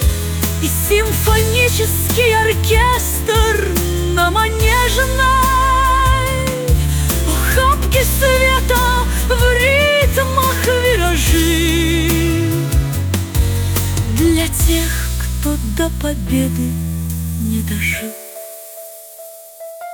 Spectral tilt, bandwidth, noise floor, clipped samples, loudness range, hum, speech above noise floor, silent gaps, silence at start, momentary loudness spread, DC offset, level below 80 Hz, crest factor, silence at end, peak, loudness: -4.5 dB/octave; 19.5 kHz; -36 dBFS; under 0.1%; 6 LU; none; 21 dB; none; 0 s; 9 LU; under 0.1%; -20 dBFS; 12 dB; 0 s; -2 dBFS; -15 LUFS